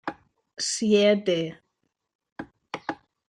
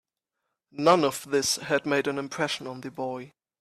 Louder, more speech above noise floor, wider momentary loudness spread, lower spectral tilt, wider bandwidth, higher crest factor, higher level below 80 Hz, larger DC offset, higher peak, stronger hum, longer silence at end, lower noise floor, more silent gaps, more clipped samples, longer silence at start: about the same, -24 LUFS vs -26 LUFS; about the same, 55 dB vs 57 dB; first, 23 LU vs 14 LU; about the same, -4 dB/octave vs -3.5 dB/octave; second, 10.5 kHz vs 15.5 kHz; about the same, 18 dB vs 20 dB; about the same, -70 dBFS vs -68 dBFS; neither; about the same, -8 dBFS vs -6 dBFS; neither; about the same, 0.35 s vs 0.3 s; second, -78 dBFS vs -83 dBFS; first, 2.15-2.19 s, 2.32-2.36 s vs none; neither; second, 0.05 s vs 0.75 s